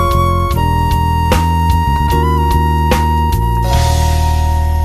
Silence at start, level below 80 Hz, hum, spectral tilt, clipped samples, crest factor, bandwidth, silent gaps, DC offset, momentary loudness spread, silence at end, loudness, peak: 0 s; -16 dBFS; none; -6 dB/octave; under 0.1%; 12 dB; 15 kHz; none; under 0.1%; 1 LU; 0 s; -13 LUFS; 0 dBFS